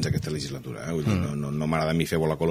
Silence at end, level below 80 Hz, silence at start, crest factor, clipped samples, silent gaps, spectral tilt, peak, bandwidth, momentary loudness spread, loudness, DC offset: 0 s; -46 dBFS; 0 s; 18 dB; under 0.1%; none; -6 dB/octave; -8 dBFS; 16 kHz; 7 LU; -27 LUFS; under 0.1%